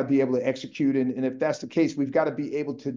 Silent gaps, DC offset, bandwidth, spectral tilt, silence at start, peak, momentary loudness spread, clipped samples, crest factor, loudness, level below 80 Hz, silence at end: none; under 0.1%; 7.6 kHz; -7 dB/octave; 0 s; -10 dBFS; 6 LU; under 0.1%; 14 dB; -26 LUFS; -72 dBFS; 0 s